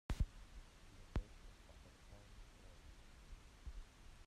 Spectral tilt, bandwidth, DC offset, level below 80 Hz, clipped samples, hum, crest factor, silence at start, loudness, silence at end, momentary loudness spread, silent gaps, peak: -6 dB/octave; 13.5 kHz; under 0.1%; -52 dBFS; under 0.1%; none; 22 dB; 0.1 s; -55 LUFS; 0 s; 16 LU; none; -28 dBFS